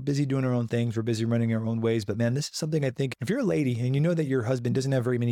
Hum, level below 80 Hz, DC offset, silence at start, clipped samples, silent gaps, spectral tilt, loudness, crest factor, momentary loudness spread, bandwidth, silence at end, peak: none; -64 dBFS; under 0.1%; 0 s; under 0.1%; none; -7 dB/octave; -27 LUFS; 12 dB; 3 LU; 13.5 kHz; 0 s; -14 dBFS